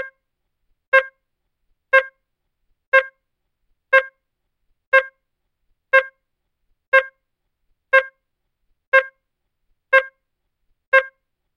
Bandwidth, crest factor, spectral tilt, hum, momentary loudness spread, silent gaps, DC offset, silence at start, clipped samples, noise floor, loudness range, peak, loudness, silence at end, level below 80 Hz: 10 kHz; 20 dB; 0.5 dB/octave; none; 18 LU; 0.87-0.92 s, 2.87-2.92 s, 4.87-4.92 s, 6.87-6.92 s, 8.87-8.92 s, 10.87-10.92 s; under 0.1%; 0 s; under 0.1%; -75 dBFS; 0 LU; -2 dBFS; -17 LUFS; 0.5 s; -72 dBFS